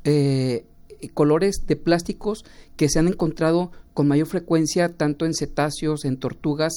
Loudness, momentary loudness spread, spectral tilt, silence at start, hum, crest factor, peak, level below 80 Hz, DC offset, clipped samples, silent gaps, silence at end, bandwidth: -22 LUFS; 9 LU; -6 dB/octave; 0 s; none; 16 dB; -6 dBFS; -40 dBFS; under 0.1%; under 0.1%; none; 0 s; 17.5 kHz